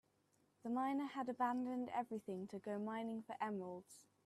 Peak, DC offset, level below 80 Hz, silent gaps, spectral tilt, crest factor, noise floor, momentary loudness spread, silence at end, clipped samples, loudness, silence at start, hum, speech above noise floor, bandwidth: -28 dBFS; under 0.1%; -88 dBFS; none; -6.5 dB/octave; 16 dB; -79 dBFS; 10 LU; 0.25 s; under 0.1%; -44 LUFS; 0.65 s; none; 35 dB; 13 kHz